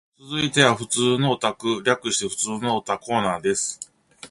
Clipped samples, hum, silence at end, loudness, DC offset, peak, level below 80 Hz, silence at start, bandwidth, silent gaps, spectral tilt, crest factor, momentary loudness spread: under 0.1%; none; 0.05 s; -22 LUFS; under 0.1%; -2 dBFS; -58 dBFS; 0.25 s; 12 kHz; none; -3.5 dB/octave; 22 dB; 8 LU